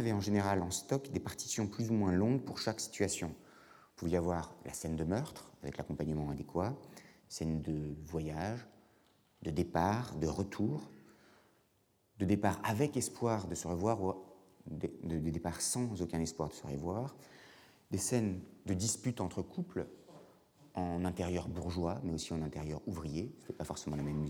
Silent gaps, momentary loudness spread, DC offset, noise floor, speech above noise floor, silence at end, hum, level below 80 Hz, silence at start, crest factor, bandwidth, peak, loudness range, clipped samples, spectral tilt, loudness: none; 12 LU; under 0.1%; -74 dBFS; 37 dB; 0 s; none; -56 dBFS; 0 s; 22 dB; 20 kHz; -16 dBFS; 4 LU; under 0.1%; -5.5 dB/octave; -37 LUFS